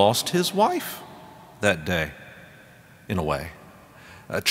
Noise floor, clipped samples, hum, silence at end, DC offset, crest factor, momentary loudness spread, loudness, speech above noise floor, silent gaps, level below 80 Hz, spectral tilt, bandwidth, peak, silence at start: -50 dBFS; under 0.1%; none; 0 s; under 0.1%; 24 dB; 25 LU; -25 LUFS; 26 dB; none; -52 dBFS; -4 dB/octave; 16 kHz; -2 dBFS; 0 s